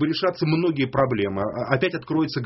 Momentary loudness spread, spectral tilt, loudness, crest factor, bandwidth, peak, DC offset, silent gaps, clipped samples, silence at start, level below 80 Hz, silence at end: 3 LU; -5 dB/octave; -23 LUFS; 20 dB; 6 kHz; -4 dBFS; under 0.1%; none; under 0.1%; 0 s; -54 dBFS; 0 s